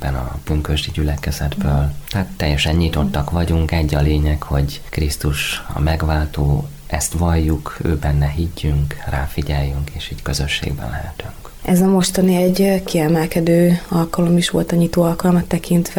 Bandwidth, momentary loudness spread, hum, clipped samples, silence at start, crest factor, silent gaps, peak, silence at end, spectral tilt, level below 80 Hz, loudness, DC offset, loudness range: 19.5 kHz; 9 LU; none; under 0.1%; 0 s; 14 dB; none; -4 dBFS; 0 s; -6 dB/octave; -26 dBFS; -18 LUFS; under 0.1%; 5 LU